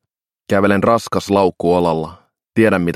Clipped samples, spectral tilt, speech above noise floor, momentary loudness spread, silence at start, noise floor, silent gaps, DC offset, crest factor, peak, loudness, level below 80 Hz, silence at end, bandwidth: under 0.1%; -6.5 dB/octave; 29 dB; 9 LU; 0.5 s; -43 dBFS; none; under 0.1%; 16 dB; 0 dBFS; -16 LUFS; -48 dBFS; 0 s; 15 kHz